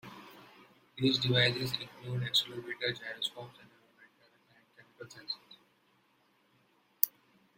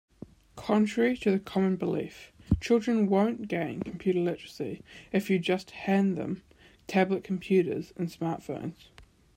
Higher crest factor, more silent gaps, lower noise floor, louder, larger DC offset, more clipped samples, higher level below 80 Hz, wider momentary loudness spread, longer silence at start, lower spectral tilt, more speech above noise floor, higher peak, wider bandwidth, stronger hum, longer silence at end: first, 34 dB vs 18 dB; neither; first, -71 dBFS vs -49 dBFS; second, -32 LUFS vs -29 LUFS; neither; neither; second, -70 dBFS vs -52 dBFS; first, 24 LU vs 12 LU; second, 0.05 s vs 0.55 s; second, -4 dB/octave vs -7 dB/octave; first, 37 dB vs 21 dB; first, -2 dBFS vs -10 dBFS; about the same, 16 kHz vs 15.5 kHz; neither; first, 0.5 s vs 0.35 s